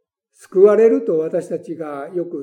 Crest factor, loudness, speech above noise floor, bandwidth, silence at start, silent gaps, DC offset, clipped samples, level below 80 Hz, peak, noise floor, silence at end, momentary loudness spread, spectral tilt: 16 dB; -16 LUFS; 35 dB; 10 kHz; 0.55 s; none; under 0.1%; under 0.1%; -84 dBFS; 0 dBFS; -52 dBFS; 0 s; 16 LU; -8 dB/octave